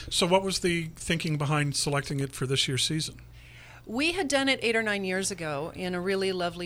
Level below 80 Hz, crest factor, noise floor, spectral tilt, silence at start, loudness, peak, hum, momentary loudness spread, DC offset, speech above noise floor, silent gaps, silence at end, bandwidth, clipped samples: -52 dBFS; 20 dB; -49 dBFS; -4 dB/octave; 0 s; -27 LUFS; -8 dBFS; none; 8 LU; under 0.1%; 21 dB; none; 0 s; 16 kHz; under 0.1%